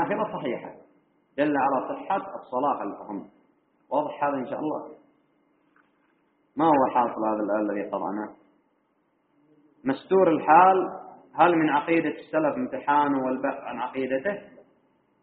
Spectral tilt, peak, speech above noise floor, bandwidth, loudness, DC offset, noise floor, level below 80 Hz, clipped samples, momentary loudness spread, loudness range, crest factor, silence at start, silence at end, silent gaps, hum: -4.5 dB/octave; -4 dBFS; 45 dB; 4 kHz; -25 LUFS; under 0.1%; -70 dBFS; -70 dBFS; under 0.1%; 16 LU; 9 LU; 22 dB; 0 s; 0.75 s; none; none